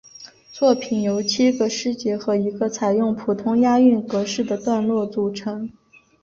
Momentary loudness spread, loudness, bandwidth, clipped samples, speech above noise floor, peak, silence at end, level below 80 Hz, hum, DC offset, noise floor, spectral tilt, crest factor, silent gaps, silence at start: 12 LU; -20 LUFS; 7.4 kHz; under 0.1%; 25 dB; -4 dBFS; 0.5 s; -62 dBFS; none; under 0.1%; -44 dBFS; -5 dB/octave; 16 dB; none; 0.2 s